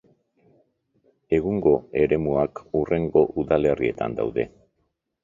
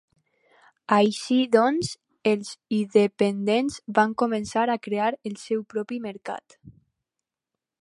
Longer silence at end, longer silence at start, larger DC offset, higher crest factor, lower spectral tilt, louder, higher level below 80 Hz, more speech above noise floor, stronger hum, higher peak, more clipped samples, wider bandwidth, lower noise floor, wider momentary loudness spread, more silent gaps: second, 0.75 s vs 1.1 s; first, 1.3 s vs 0.9 s; neither; about the same, 20 dB vs 20 dB; first, -9 dB/octave vs -5 dB/octave; about the same, -23 LUFS vs -24 LUFS; first, -48 dBFS vs -66 dBFS; second, 52 dB vs 63 dB; neither; about the same, -4 dBFS vs -4 dBFS; neither; second, 7.4 kHz vs 11.5 kHz; second, -74 dBFS vs -87 dBFS; second, 6 LU vs 12 LU; neither